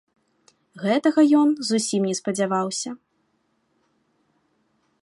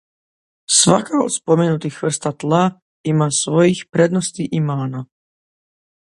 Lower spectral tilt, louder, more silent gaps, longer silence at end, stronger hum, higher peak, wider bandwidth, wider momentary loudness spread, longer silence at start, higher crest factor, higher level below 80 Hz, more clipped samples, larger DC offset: about the same, -4.5 dB/octave vs -4.5 dB/octave; second, -21 LUFS vs -17 LUFS; second, none vs 2.82-3.04 s; first, 2.1 s vs 1.05 s; neither; second, -8 dBFS vs 0 dBFS; about the same, 11.5 kHz vs 11.5 kHz; first, 13 LU vs 9 LU; about the same, 0.75 s vs 0.7 s; about the same, 16 dB vs 18 dB; second, -76 dBFS vs -60 dBFS; neither; neither